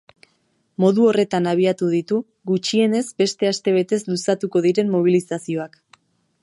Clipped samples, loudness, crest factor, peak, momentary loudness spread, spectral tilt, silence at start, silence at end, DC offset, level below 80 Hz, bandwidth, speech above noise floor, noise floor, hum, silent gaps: under 0.1%; -20 LUFS; 16 dB; -4 dBFS; 9 LU; -5.5 dB/octave; 0.8 s; 0.75 s; under 0.1%; -68 dBFS; 11.5 kHz; 47 dB; -66 dBFS; none; none